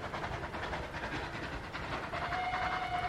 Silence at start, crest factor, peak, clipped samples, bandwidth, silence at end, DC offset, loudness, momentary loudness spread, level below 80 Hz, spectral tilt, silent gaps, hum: 0 s; 16 dB; -22 dBFS; under 0.1%; 14 kHz; 0 s; under 0.1%; -38 LUFS; 6 LU; -50 dBFS; -5 dB/octave; none; none